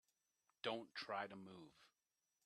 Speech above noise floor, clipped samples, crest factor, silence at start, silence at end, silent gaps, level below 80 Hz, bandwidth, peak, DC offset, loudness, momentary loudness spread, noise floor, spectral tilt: over 40 dB; under 0.1%; 24 dB; 0.65 s; 0.6 s; none; under -90 dBFS; 13 kHz; -28 dBFS; under 0.1%; -49 LUFS; 15 LU; under -90 dBFS; -4.5 dB/octave